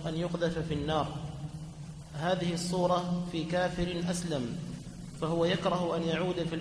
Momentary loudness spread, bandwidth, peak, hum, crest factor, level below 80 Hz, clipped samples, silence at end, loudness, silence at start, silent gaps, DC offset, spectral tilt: 13 LU; 11 kHz; -16 dBFS; none; 16 dB; -52 dBFS; under 0.1%; 0 s; -32 LUFS; 0 s; none; under 0.1%; -5.5 dB/octave